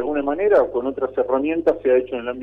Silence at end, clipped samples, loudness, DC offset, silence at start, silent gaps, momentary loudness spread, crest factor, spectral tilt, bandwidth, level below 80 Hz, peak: 0 s; under 0.1%; -20 LUFS; under 0.1%; 0 s; none; 7 LU; 14 dB; -7.5 dB/octave; 4.7 kHz; -52 dBFS; -6 dBFS